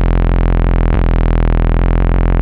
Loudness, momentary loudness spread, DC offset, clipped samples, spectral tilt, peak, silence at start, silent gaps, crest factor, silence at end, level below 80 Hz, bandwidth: -15 LUFS; 0 LU; under 0.1%; under 0.1%; -10.5 dB/octave; 0 dBFS; 0 s; none; 10 dB; 0 s; -12 dBFS; 3.9 kHz